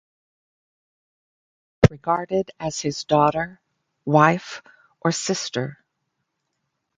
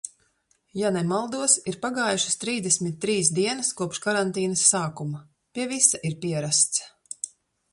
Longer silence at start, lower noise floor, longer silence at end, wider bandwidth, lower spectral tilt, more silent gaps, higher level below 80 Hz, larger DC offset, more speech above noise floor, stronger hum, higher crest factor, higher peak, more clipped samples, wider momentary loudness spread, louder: first, 1.8 s vs 0.05 s; first, -77 dBFS vs -68 dBFS; first, 1.25 s vs 0.45 s; second, 9.6 kHz vs 11.5 kHz; first, -5 dB/octave vs -3 dB/octave; neither; first, -48 dBFS vs -68 dBFS; neither; first, 55 dB vs 43 dB; neither; about the same, 24 dB vs 22 dB; first, 0 dBFS vs -4 dBFS; neither; about the same, 15 LU vs 15 LU; about the same, -22 LUFS vs -23 LUFS